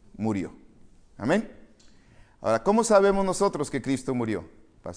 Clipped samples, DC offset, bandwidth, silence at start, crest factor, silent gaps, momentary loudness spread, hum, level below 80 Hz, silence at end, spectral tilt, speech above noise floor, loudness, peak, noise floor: under 0.1%; under 0.1%; 10.5 kHz; 0.2 s; 20 dB; none; 14 LU; none; -50 dBFS; 0 s; -5.5 dB/octave; 30 dB; -25 LUFS; -6 dBFS; -54 dBFS